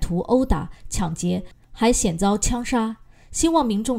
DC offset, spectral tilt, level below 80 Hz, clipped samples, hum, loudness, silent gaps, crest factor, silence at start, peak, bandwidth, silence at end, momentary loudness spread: under 0.1%; -5 dB/octave; -32 dBFS; under 0.1%; none; -22 LUFS; none; 18 dB; 0 s; -4 dBFS; 16 kHz; 0 s; 10 LU